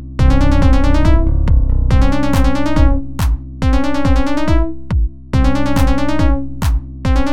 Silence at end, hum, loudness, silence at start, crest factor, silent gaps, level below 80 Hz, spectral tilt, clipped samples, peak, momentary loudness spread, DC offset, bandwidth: 0 s; none; -16 LUFS; 0 s; 12 dB; none; -14 dBFS; -7 dB/octave; under 0.1%; 0 dBFS; 6 LU; 10%; 14 kHz